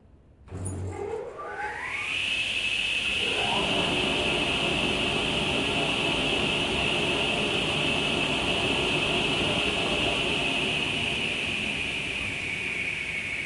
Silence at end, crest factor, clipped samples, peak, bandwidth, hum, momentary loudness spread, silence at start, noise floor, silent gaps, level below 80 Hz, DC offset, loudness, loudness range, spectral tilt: 0 s; 14 dB; under 0.1%; -12 dBFS; 11.5 kHz; none; 9 LU; 0.4 s; -53 dBFS; none; -48 dBFS; under 0.1%; -25 LUFS; 2 LU; -3.5 dB/octave